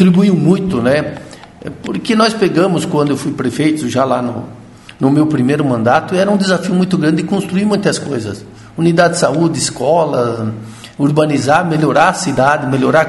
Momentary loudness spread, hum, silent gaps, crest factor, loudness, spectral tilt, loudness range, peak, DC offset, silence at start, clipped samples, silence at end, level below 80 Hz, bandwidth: 12 LU; none; none; 14 dB; -13 LUFS; -6 dB/octave; 2 LU; 0 dBFS; under 0.1%; 0 s; under 0.1%; 0 s; -48 dBFS; 12 kHz